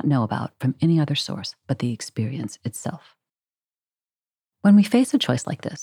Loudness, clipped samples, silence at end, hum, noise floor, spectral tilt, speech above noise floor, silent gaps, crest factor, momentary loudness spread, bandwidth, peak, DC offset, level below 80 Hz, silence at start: -22 LUFS; under 0.1%; 0 s; none; under -90 dBFS; -6 dB/octave; over 68 dB; 3.64-3.68 s; 18 dB; 15 LU; 15 kHz; -6 dBFS; under 0.1%; -72 dBFS; 0.05 s